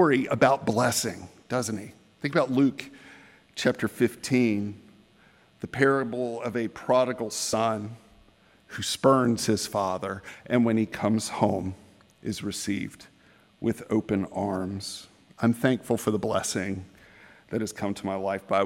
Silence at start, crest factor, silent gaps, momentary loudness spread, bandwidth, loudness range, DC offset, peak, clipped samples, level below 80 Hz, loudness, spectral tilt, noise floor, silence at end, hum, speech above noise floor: 0 s; 22 dB; none; 15 LU; 16.5 kHz; 4 LU; under 0.1%; -6 dBFS; under 0.1%; -64 dBFS; -27 LUFS; -5 dB/octave; -59 dBFS; 0 s; none; 33 dB